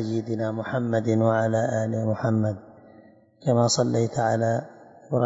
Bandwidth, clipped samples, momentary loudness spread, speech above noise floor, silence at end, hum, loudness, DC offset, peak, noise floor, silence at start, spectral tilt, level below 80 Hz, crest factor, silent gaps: 8 kHz; under 0.1%; 8 LU; 29 dB; 0 s; none; -24 LUFS; under 0.1%; -8 dBFS; -53 dBFS; 0 s; -6 dB/octave; -66 dBFS; 18 dB; none